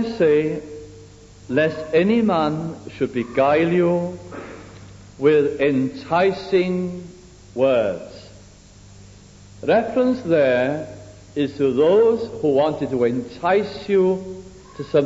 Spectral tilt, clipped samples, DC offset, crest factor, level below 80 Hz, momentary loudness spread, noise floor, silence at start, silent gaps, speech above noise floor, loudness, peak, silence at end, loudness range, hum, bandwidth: -7 dB/octave; under 0.1%; under 0.1%; 16 dB; -52 dBFS; 19 LU; -45 dBFS; 0 s; none; 26 dB; -20 LUFS; -4 dBFS; 0 s; 4 LU; 50 Hz at -50 dBFS; 8 kHz